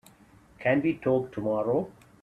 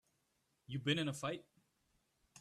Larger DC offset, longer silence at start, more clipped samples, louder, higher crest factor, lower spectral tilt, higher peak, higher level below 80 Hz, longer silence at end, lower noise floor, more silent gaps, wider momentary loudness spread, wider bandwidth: neither; about the same, 0.6 s vs 0.7 s; neither; first, -28 LUFS vs -40 LUFS; about the same, 18 dB vs 20 dB; first, -8.5 dB/octave vs -5 dB/octave; first, -12 dBFS vs -24 dBFS; first, -62 dBFS vs -78 dBFS; first, 0.3 s vs 0 s; second, -56 dBFS vs -82 dBFS; neither; second, 5 LU vs 11 LU; about the same, 13 kHz vs 13.5 kHz